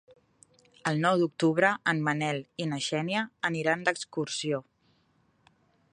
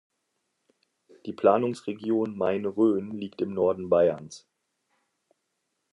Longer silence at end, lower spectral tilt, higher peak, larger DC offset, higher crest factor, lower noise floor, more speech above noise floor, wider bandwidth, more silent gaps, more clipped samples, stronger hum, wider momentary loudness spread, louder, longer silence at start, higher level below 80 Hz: second, 1.3 s vs 1.55 s; second, -5 dB/octave vs -7 dB/octave; about the same, -8 dBFS vs -8 dBFS; neither; about the same, 22 dB vs 20 dB; second, -69 dBFS vs -79 dBFS; second, 40 dB vs 53 dB; about the same, 11 kHz vs 11 kHz; neither; neither; neither; second, 8 LU vs 15 LU; about the same, -28 LUFS vs -26 LUFS; second, 0.85 s vs 1.25 s; about the same, -76 dBFS vs -76 dBFS